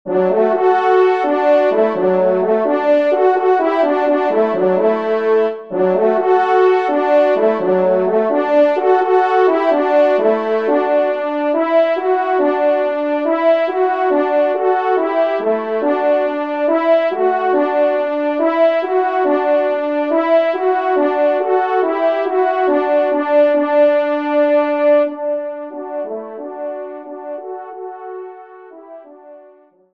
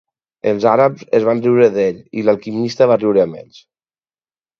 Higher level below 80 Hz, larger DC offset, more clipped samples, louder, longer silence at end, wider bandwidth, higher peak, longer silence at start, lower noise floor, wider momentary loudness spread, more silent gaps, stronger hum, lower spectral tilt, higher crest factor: second, -70 dBFS vs -60 dBFS; first, 0.3% vs under 0.1%; neither; about the same, -15 LUFS vs -15 LUFS; second, 0.55 s vs 1.2 s; second, 6 kHz vs 7 kHz; about the same, -2 dBFS vs 0 dBFS; second, 0.05 s vs 0.45 s; second, -47 dBFS vs under -90 dBFS; about the same, 11 LU vs 9 LU; neither; neither; about the same, -7.5 dB/octave vs -7 dB/octave; about the same, 12 dB vs 16 dB